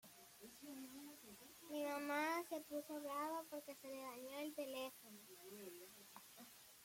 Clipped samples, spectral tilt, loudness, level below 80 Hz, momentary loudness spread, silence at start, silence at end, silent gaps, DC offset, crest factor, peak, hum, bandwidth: under 0.1%; -2.5 dB/octave; -49 LUFS; -88 dBFS; 16 LU; 0.05 s; 0 s; none; under 0.1%; 20 dB; -30 dBFS; none; 16.5 kHz